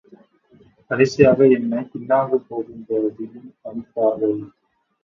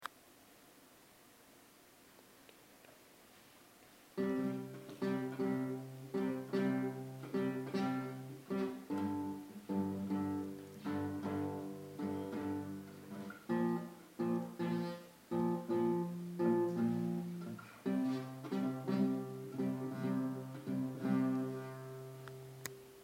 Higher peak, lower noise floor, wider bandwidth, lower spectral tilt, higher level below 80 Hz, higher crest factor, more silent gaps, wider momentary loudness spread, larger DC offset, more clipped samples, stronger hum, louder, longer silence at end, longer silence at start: first, 0 dBFS vs -20 dBFS; second, -54 dBFS vs -63 dBFS; second, 7.4 kHz vs 16 kHz; about the same, -7 dB/octave vs -7.5 dB/octave; first, -58 dBFS vs -82 dBFS; about the same, 20 dB vs 20 dB; neither; first, 19 LU vs 14 LU; neither; neither; neither; first, -19 LUFS vs -40 LUFS; first, 0.55 s vs 0 s; first, 0.9 s vs 0 s